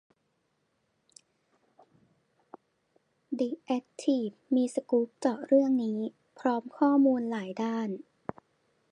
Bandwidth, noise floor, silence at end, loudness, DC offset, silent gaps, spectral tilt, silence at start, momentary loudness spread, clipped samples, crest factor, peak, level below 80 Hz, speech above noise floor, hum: 10.5 kHz; -76 dBFS; 0.95 s; -29 LUFS; under 0.1%; none; -6.5 dB/octave; 3.3 s; 14 LU; under 0.1%; 20 dB; -12 dBFS; -80 dBFS; 48 dB; none